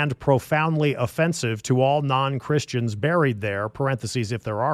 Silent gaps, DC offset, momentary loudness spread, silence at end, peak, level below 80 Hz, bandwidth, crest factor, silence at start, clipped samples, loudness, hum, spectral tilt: none; under 0.1%; 6 LU; 0 s; -4 dBFS; -56 dBFS; 14.5 kHz; 18 dB; 0 s; under 0.1%; -23 LUFS; none; -6 dB/octave